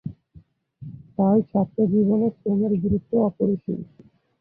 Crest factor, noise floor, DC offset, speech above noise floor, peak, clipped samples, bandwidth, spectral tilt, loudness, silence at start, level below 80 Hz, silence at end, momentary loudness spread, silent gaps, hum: 14 dB; -52 dBFS; under 0.1%; 31 dB; -8 dBFS; under 0.1%; 1.6 kHz; -14.5 dB/octave; -22 LUFS; 0.05 s; -50 dBFS; 0.55 s; 20 LU; none; none